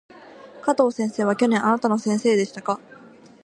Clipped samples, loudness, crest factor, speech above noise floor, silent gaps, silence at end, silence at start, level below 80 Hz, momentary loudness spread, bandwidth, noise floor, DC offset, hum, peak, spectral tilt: under 0.1%; -22 LUFS; 18 dB; 26 dB; none; 0.7 s; 0.45 s; -72 dBFS; 9 LU; 11 kHz; -47 dBFS; under 0.1%; none; -4 dBFS; -5.5 dB/octave